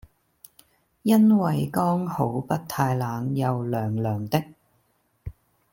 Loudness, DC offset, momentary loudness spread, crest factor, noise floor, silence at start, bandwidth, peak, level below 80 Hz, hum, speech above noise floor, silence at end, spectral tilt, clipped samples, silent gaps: -24 LUFS; under 0.1%; 22 LU; 18 dB; -68 dBFS; 1.05 s; 17 kHz; -8 dBFS; -56 dBFS; none; 45 dB; 0.4 s; -7.5 dB/octave; under 0.1%; none